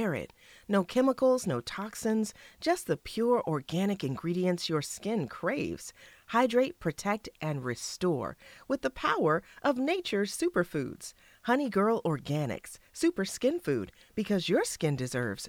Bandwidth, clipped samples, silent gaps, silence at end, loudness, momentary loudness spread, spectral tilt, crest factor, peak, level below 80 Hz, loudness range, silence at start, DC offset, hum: 17.5 kHz; under 0.1%; none; 0 s; -31 LUFS; 10 LU; -5 dB/octave; 18 dB; -12 dBFS; -62 dBFS; 2 LU; 0 s; under 0.1%; none